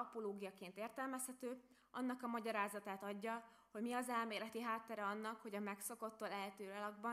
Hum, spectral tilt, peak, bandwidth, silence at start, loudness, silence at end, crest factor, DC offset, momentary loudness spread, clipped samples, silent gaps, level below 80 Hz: none; -3.5 dB/octave; -28 dBFS; 15.5 kHz; 0 s; -47 LUFS; 0 s; 20 dB; under 0.1%; 8 LU; under 0.1%; none; -90 dBFS